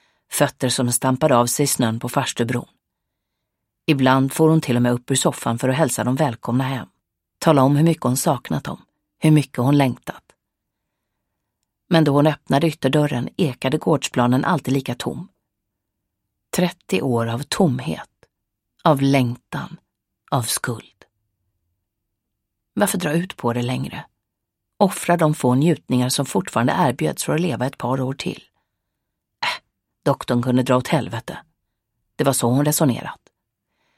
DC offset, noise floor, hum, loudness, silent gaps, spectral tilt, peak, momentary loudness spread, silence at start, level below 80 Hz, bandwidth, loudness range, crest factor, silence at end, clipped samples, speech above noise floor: under 0.1%; -80 dBFS; none; -20 LUFS; none; -5.5 dB/octave; 0 dBFS; 12 LU; 0.3 s; -58 dBFS; 16.5 kHz; 6 LU; 20 dB; 0.85 s; under 0.1%; 60 dB